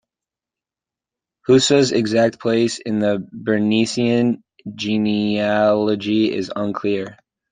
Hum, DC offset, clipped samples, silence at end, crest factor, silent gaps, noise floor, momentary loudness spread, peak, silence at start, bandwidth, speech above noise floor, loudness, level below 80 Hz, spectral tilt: none; under 0.1%; under 0.1%; 0.4 s; 16 dB; none; -89 dBFS; 9 LU; -2 dBFS; 1.5 s; 9.6 kHz; 71 dB; -18 LUFS; -60 dBFS; -5 dB/octave